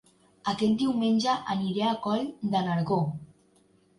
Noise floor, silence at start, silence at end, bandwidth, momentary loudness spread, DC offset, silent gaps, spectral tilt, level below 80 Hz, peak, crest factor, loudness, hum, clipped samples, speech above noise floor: -63 dBFS; 0.45 s; 0.75 s; 11.5 kHz; 8 LU; under 0.1%; none; -6.5 dB/octave; -64 dBFS; -14 dBFS; 14 dB; -28 LUFS; none; under 0.1%; 37 dB